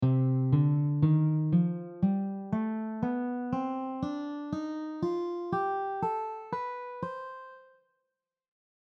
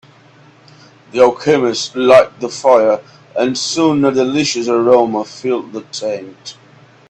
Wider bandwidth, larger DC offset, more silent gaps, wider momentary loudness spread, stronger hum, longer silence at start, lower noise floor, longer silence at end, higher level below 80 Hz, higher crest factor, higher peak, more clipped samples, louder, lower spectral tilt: second, 6 kHz vs 9.4 kHz; neither; neither; second, 12 LU vs 15 LU; neither; second, 0 s vs 1.15 s; first, -85 dBFS vs -45 dBFS; first, 1.35 s vs 0.6 s; second, -64 dBFS vs -56 dBFS; about the same, 16 dB vs 14 dB; second, -14 dBFS vs 0 dBFS; neither; second, -31 LUFS vs -14 LUFS; first, -10.5 dB/octave vs -4.5 dB/octave